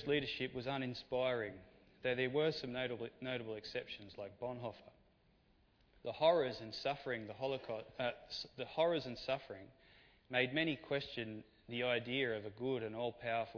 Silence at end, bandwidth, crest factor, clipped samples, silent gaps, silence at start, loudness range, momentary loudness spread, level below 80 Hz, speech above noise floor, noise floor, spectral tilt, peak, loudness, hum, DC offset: 0 s; 5.4 kHz; 22 dB; under 0.1%; none; 0 s; 3 LU; 12 LU; -70 dBFS; 32 dB; -72 dBFS; -3 dB/octave; -20 dBFS; -40 LUFS; none; under 0.1%